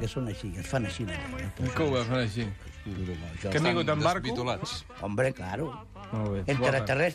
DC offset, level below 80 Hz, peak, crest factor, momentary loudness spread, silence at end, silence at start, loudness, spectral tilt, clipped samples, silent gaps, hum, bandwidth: under 0.1%; -48 dBFS; -12 dBFS; 18 dB; 11 LU; 0 s; 0 s; -30 LUFS; -6 dB/octave; under 0.1%; none; none; 13.5 kHz